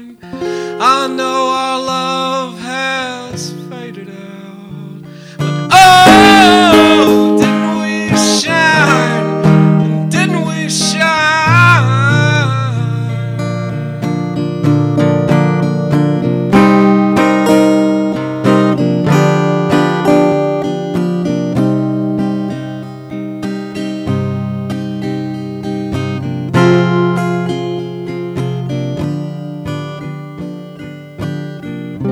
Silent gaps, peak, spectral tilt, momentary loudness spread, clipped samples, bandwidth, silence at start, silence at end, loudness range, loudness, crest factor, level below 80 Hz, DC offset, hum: none; 0 dBFS; -5.5 dB/octave; 17 LU; 0.5%; 17 kHz; 0 s; 0 s; 13 LU; -12 LUFS; 12 dB; -46 dBFS; under 0.1%; none